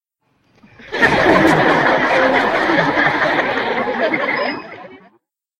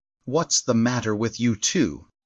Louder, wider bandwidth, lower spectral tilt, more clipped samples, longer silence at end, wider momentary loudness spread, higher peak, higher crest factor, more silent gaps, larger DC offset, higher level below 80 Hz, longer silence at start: first, -14 LUFS vs -23 LUFS; first, 15.5 kHz vs 12 kHz; first, -5.5 dB/octave vs -4 dB/octave; neither; first, 0.65 s vs 0.2 s; first, 9 LU vs 6 LU; first, 0 dBFS vs -10 dBFS; about the same, 16 dB vs 14 dB; neither; neither; first, -46 dBFS vs -56 dBFS; first, 0.8 s vs 0.25 s